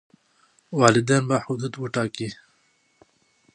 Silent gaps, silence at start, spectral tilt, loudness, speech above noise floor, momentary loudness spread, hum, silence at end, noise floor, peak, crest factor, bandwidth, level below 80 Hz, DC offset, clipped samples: none; 0.7 s; -5 dB/octave; -23 LUFS; 43 dB; 14 LU; none; 1.2 s; -65 dBFS; -2 dBFS; 24 dB; 10.5 kHz; -62 dBFS; under 0.1%; under 0.1%